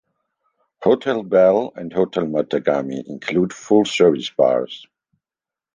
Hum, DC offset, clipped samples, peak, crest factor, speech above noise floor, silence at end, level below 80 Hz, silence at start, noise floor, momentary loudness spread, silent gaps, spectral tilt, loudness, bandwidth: none; under 0.1%; under 0.1%; -2 dBFS; 18 dB; 72 dB; 0.95 s; -60 dBFS; 0.8 s; -90 dBFS; 10 LU; none; -5.5 dB/octave; -19 LUFS; 9.6 kHz